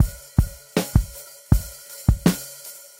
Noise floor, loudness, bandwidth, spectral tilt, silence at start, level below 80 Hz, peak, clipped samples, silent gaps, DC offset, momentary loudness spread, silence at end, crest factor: -41 dBFS; -23 LUFS; 17 kHz; -6 dB/octave; 0 s; -28 dBFS; 0 dBFS; under 0.1%; none; under 0.1%; 15 LU; 0.25 s; 22 dB